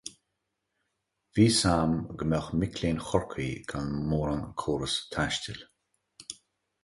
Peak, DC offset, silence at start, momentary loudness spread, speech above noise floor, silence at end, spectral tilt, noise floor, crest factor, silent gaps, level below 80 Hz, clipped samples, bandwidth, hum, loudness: -8 dBFS; under 0.1%; 0.05 s; 20 LU; 53 dB; 0.5 s; -5 dB/octave; -82 dBFS; 22 dB; none; -48 dBFS; under 0.1%; 11.5 kHz; none; -29 LUFS